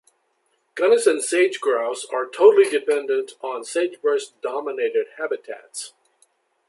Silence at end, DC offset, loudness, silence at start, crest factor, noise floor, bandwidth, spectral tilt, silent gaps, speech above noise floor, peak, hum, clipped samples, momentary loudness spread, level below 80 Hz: 0.8 s; under 0.1%; -21 LUFS; 0.75 s; 20 dB; -69 dBFS; 11.5 kHz; -1.5 dB/octave; none; 48 dB; -2 dBFS; none; under 0.1%; 16 LU; -82 dBFS